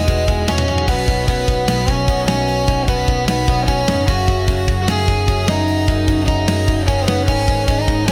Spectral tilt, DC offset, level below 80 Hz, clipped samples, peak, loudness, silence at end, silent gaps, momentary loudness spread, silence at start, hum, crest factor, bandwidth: -5.5 dB/octave; under 0.1%; -22 dBFS; under 0.1%; -4 dBFS; -17 LUFS; 0 s; none; 1 LU; 0 s; none; 10 dB; 16.5 kHz